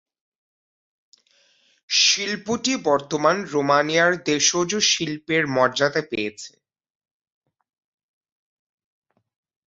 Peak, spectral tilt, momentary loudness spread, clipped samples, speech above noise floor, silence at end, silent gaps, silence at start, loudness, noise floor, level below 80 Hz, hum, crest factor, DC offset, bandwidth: -4 dBFS; -2 dB/octave; 9 LU; under 0.1%; 40 dB; 3.25 s; none; 1.9 s; -20 LUFS; -61 dBFS; -66 dBFS; none; 20 dB; under 0.1%; 8 kHz